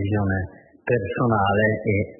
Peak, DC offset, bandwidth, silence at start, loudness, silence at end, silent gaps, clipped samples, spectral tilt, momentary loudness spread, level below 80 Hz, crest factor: -8 dBFS; under 0.1%; 3.1 kHz; 0 s; -22 LUFS; 0.05 s; none; under 0.1%; -12 dB/octave; 10 LU; -50 dBFS; 14 dB